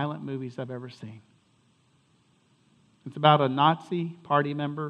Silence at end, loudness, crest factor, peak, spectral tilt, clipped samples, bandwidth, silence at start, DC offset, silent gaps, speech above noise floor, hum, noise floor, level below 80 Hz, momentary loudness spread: 0 s; -26 LUFS; 26 dB; -4 dBFS; -7.5 dB/octave; under 0.1%; 8.4 kHz; 0 s; under 0.1%; none; 39 dB; none; -65 dBFS; -78 dBFS; 22 LU